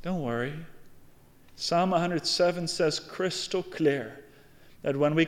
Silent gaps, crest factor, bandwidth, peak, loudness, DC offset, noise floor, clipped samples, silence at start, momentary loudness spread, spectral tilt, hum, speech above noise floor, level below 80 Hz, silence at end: none; 16 dB; 16.5 kHz; -12 dBFS; -28 LUFS; under 0.1%; -54 dBFS; under 0.1%; 0 s; 10 LU; -4.5 dB/octave; none; 26 dB; -60 dBFS; 0 s